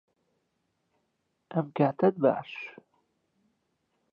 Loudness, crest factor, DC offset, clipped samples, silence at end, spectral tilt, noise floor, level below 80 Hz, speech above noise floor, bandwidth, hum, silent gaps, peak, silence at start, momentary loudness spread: -28 LUFS; 22 dB; under 0.1%; under 0.1%; 1.4 s; -10 dB/octave; -78 dBFS; -80 dBFS; 51 dB; 5.4 kHz; none; none; -10 dBFS; 1.5 s; 16 LU